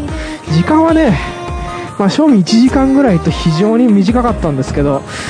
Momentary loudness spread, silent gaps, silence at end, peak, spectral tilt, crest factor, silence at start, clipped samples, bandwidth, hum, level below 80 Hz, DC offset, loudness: 12 LU; none; 0 s; 0 dBFS; -6.5 dB/octave; 12 dB; 0 s; under 0.1%; 10.5 kHz; none; -26 dBFS; under 0.1%; -11 LUFS